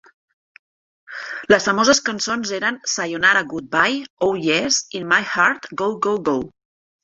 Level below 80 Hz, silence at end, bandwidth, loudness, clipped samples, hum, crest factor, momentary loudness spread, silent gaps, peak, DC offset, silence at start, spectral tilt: -58 dBFS; 0.55 s; 8.2 kHz; -19 LUFS; under 0.1%; none; 20 dB; 9 LU; 4.10-4.17 s; -2 dBFS; under 0.1%; 1.1 s; -2.5 dB/octave